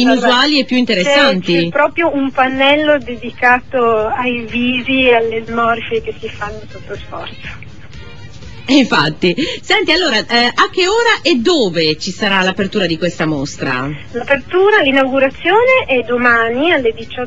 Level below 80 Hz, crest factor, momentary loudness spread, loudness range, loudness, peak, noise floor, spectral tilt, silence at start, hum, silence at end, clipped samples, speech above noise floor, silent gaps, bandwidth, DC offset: -42 dBFS; 14 dB; 14 LU; 5 LU; -13 LUFS; 0 dBFS; -34 dBFS; -4.5 dB/octave; 0 s; none; 0 s; under 0.1%; 20 dB; none; 8.2 kHz; 2%